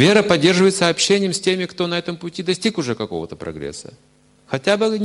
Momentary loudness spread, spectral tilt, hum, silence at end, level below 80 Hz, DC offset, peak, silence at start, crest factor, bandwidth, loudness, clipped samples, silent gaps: 15 LU; -4 dB/octave; none; 0 s; -54 dBFS; under 0.1%; 0 dBFS; 0 s; 18 dB; 11.5 kHz; -18 LUFS; under 0.1%; none